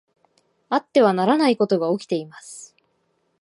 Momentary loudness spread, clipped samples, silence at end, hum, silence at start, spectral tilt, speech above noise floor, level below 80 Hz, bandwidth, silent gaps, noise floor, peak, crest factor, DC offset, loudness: 21 LU; under 0.1%; 0.75 s; none; 0.7 s; -5.5 dB/octave; 49 dB; -76 dBFS; 11.5 kHz; none; -69 dBFS; -4 dBFS; 18 dB; under 0.1%; -20 LUFS